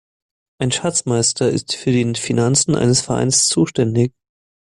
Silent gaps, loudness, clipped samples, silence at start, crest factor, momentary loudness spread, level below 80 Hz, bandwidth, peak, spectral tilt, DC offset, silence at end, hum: none; -17 LUFS; under 0.1%; 0.6 s; 16 dB; 6 LU; -50 dBFS; 12 kHz; -2 dBFS; -4 dB/octave; under 0.1%; 0.6 s; none